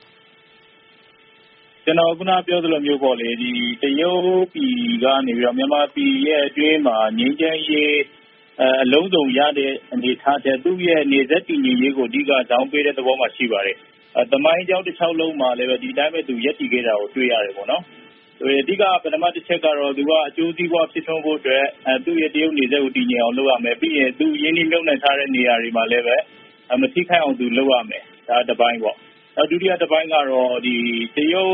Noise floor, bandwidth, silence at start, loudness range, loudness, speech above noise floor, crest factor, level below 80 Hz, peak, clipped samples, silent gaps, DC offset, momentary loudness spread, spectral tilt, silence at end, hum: -51 dBFS; 3.9 kHz; 1.85 s; 2 LU; -18 LUFS; 33 dB; 18 dB; -68 dBFS; 0 dBFS; under 0.1%; none; under 0.1%; 5 LU; -1.5 dB/octave; 0 s; none